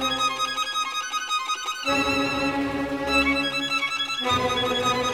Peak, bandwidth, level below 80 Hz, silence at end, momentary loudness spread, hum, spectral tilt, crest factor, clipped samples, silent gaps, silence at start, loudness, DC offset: -8 dBFS; 17.5 kHz; -48 dBFS; 0 s; 5 LU; none; -2.5 dB/octave; 16 dB; under 0.1%; none; 0 s; -24 LUFS; 0.1%